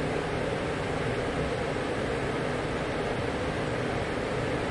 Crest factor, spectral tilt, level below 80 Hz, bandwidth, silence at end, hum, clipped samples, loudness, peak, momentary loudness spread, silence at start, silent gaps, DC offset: 12 dB; -6 dB/octave; -44 dBFS; 11.5 kHz; 0 s; none; under 0.1%; -30 LUFS; -18 dBFS; 1 LU; 0 s; none; under 0.1%